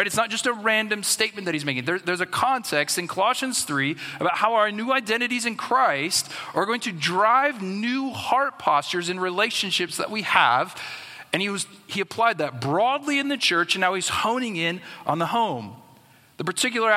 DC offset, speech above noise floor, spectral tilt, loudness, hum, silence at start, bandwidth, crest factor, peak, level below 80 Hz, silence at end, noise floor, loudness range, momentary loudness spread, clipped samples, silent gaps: under 0.1%; 30 dB; -2.5 dB/octave; -23 LUFS; none; 0 s; 16 kHz; 22 dB; -2 dBFS; -68 dBFS; 0 s; -54 dBFS; 1 LU; 7 LU; under 0.1%; none